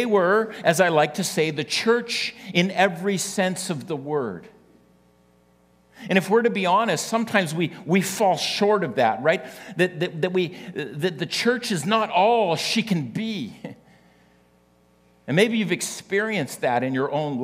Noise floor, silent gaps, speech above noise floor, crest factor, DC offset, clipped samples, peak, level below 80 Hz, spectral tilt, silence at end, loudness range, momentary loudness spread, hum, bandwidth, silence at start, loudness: -59 dBFS; none; 37 dB; 20 dB; under 0.1%; under 0.1%; -2 dBFS; -70 dBFS; -4.5 dB/octave; 0 s; 5 LU; 9 LU; 60 Hz at -55 dBFS; 16 kHz; 0 s; -22 LUFS